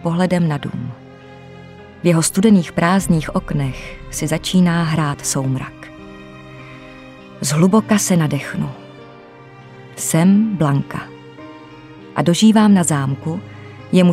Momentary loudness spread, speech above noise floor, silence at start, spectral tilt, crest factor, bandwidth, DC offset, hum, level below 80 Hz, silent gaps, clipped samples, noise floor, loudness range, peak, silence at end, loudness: 24 LU; 24 dB; 0 s; -5.5 dB/octave; 16 dB; 16 kHz; under 0.1%; none; -44 dBFS; none; under 0.1%; -40 dBFS; 4 LU; 0 dBFS; 0 s; -16 LUFS